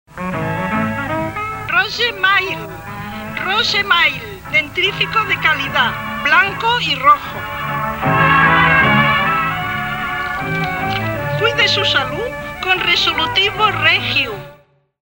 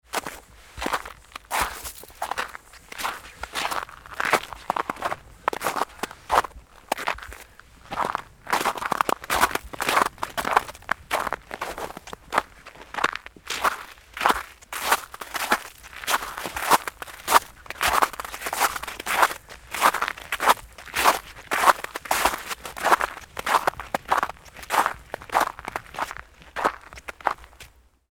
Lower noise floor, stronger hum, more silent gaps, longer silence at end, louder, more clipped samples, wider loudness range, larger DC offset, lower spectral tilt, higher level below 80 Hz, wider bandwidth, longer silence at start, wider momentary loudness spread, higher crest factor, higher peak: about the same, -48 dBFS vs -50 dBFS; neither; neither; about the same, 0.45 s vs 0.45 s; first, -15 LUFS vs -25 LUFS; neither; about the same, 4 LU vs 6 LU; neither; first, -4 dB/octave vs -1.5 dB/octave; first, -40 dBFS vs -50 dBFS; second, 16.5 kHz vs 19 kHz; about the same, 0.1 s vs 0.15 s; second, 11 LU vs 15 LU; second, 16 dB vs 26 dB; about the same, 0 dBFS vs 0 dBFS